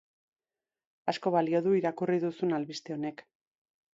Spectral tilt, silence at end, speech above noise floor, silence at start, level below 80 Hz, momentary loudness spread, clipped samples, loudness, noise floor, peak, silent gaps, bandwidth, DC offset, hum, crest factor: -6.5 dB/octave; 0.75 s; over 60 dB; 1.05 s; -80 dBFS; 10 LU; under 0.1%; -31 LUFS; under -90 dBFS; -12 dBFS; none; 7.8 kHz; under 0.1%; none; 20 dB